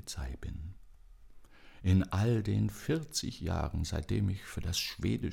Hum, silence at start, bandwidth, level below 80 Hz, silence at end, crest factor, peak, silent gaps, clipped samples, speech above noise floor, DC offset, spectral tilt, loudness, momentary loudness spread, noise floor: none; 0.05 s; 17 kHz; -46 dBFS; 0 s; 18 dB; -16 dBFS; none; under 0.1%; 21 dB; under 0.1%; -5.5 dB/octave; -34 LUFS; 12 LU; -54 dBFS